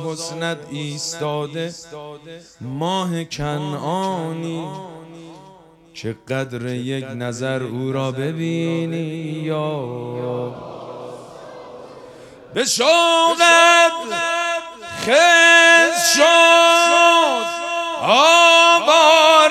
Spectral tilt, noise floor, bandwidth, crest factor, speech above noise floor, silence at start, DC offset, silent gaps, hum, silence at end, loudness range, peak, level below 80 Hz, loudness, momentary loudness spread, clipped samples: -2.5 dB/octave; -46 dBFS; 15 kHz; 18 dB; 30 dB; 0 s; under 0.1%; none; none; 0 s; 16 LU; 0 dBFS; -58 dBFS; -15 LUFS; 20 LU; under 0.1%